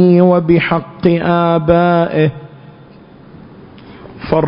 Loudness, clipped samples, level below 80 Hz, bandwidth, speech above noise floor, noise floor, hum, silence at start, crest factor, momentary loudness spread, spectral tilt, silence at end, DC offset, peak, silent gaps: -12 LUFS; under 0.1%; -40 dBFS; 5.4 kHz; 28 dB; -39 dBFS; none; 0 s; 14 dB; 7 LU; -11.5 dB/octave; 0 s; under 0.1%; 0 dBFS; none